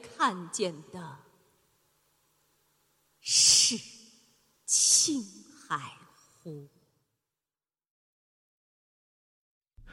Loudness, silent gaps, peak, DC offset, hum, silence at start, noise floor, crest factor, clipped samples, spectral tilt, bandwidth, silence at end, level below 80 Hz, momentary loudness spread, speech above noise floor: -24 LUFS; 7.90-9.61 s; -8 dBFS; under 0.1%; none; 0.05 s; under -90 dBFS; 24 dB; under 0.1%; 0 dB/octave; 16.5 kHz; 0 s; -70 dBFS; 27 LU; over 56 dB